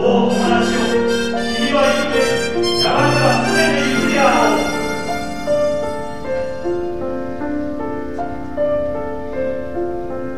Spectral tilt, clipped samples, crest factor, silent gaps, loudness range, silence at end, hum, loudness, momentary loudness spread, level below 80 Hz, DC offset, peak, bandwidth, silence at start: -4.5 dB/octave; under 0.1%; 16 dB; none; 8 LU; 0 s; none; -18 LUFS; 11 LU; -40 dBFS; 4%; -2 dBFS; 14 kHz; 0 s